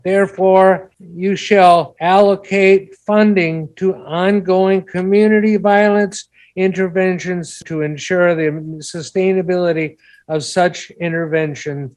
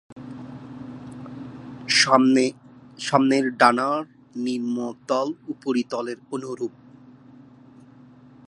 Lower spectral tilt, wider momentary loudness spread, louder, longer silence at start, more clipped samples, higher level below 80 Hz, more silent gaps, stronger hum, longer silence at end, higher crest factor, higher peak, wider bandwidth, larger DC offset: first, -6 dB/octave vs -3.5 dB/octave; second, 12 LU vs 22 LU; first, -15 LUFS vs -22 LUFS; about the same, 0.05 s vs 0.1 s; neither; first, -58 dBFS vs -68 dBFS; second, none vs 0.12-0.16 s; neither; second, 0.05 s vs 1.8 s; second, 14 dB vs 24 dB; about the same, 0 dBFS vs -2 dBFS; about the same, 11 kHz vs 11.5 kHz; neither